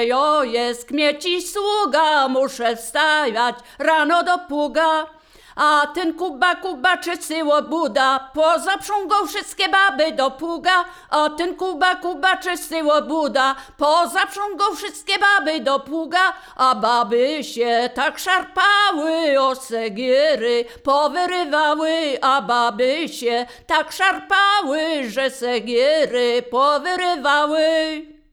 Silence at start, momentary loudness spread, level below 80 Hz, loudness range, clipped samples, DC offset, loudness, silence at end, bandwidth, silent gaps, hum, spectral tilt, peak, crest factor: 0 s; 6 LU; -56 dBFS; 1 LU; under 0.1%; under 0.1%; -19 LUFS; 0.2 s; 20 kHz; none; none; -2 dB/octave; -2 dBFS; 16 dB